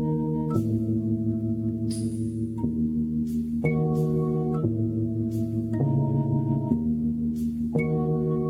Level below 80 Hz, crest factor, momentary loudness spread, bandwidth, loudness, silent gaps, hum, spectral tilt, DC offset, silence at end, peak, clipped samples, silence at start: -46 dBFS; 16 dB; 4 LU; 12 kHz; -26 LUFS; none; none; -9.5 dB/octave; under 0.1%; 0 s; -10 dBFS; under 0.1%; 0 s